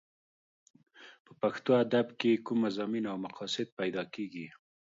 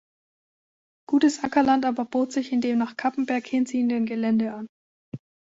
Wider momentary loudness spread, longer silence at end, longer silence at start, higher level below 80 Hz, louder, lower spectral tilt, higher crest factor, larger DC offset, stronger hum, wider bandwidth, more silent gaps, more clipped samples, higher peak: second, 12 LU vs 20 LU; about the same, 0.45 s vs 0.4 s; about the same, 1 s vs 1.1 s; second, -80 dBFS vs -68 dBFS; second, -32 LUFS vs -24 LUFS; about the same, -6 dB/octave vs -5 dB/octave; about the same, 20 dB vs 16 dB; neither; neither; about the same, 7.8 kHz vs 8 kHz; second, 1.20-1.25 s, 3.72-3.77 s vs 4.69-5.12 s; neither; second, -14 dBFS vs -8 dBFS